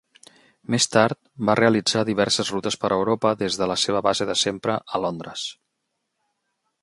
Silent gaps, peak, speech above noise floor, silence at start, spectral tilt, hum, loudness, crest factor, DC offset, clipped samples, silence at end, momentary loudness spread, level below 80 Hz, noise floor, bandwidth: none; -2 dBFS; 55 dB; 0.7 s; -3.5 dB/octave; none; -22 LUFS; 22 dB; under 0.1%; under 0.1%; 1.3 s; 10 LU; -60 dBFS; -77 dBFS; 11.5 kHz